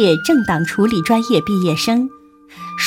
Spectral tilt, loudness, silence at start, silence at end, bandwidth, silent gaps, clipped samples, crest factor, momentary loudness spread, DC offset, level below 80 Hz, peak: -5.5 dB/octave; -16 LUFS; 0 s; 0 s; 16.5 kHz; none; under 0.1%; 14 dB; 10 LU; under 0.1%; -50 dBFS; -2 dBFS